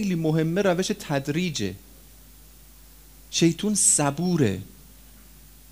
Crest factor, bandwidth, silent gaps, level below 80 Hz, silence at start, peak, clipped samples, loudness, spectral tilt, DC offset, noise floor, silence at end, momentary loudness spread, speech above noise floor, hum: 18 dB; 16 kHz; none; -52 dBFS; 0 s; -8 dBFS; under 0.1%; -23 LUFS; -4 dB/octave; 0.1%; -49 dBFS; 1 s; 14 LU; 26 dB; none